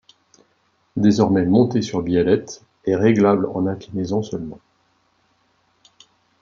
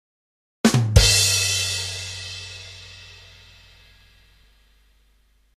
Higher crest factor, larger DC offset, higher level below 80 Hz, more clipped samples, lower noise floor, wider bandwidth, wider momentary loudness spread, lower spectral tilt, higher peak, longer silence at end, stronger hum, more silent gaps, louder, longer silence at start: second, 18 dB vs 24 dB; neither; second, -56 dBFS vs -32 dBFS; neither; first, -64 dBFS vs -60 dBFS; second, 7.4 kHz vs 15.5 kHz; second, 14 LU vs 24 LU; first, -7 dB/octave vs -3 dB/octave; about the same, -2 dBFS vs 0 dBFS; second, 1.85 s vs 2.45 s; second, none vs 50 Hz at -55 dBFS; neither; about the same, -19 LUFS vs -19 LUFS; first, 0.95 s vs 0.65 s